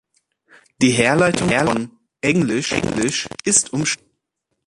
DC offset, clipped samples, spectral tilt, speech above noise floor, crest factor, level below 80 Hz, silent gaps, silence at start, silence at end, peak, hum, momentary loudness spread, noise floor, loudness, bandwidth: under 0.1%; under 0.1%; -3.5 dB/octave; 57 dB; 18 dB; -48 dBFS; none; 0.8 s; 0.7 s; -2 dBFS; none; 8 LU; -75 dBFS; -18 LUFS; 11.5 kHz